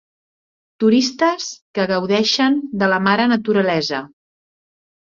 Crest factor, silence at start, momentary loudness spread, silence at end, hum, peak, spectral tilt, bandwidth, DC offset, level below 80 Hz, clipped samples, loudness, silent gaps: 16 dB; 0.8 s; 8 LU; 1.05 s; none; -2 dBFS; -4.5 dB/octave; 7.6 kHz; under 0.1%; -62 dBFS; under 0.1%; -17 LUFS; 1.62-1.74 s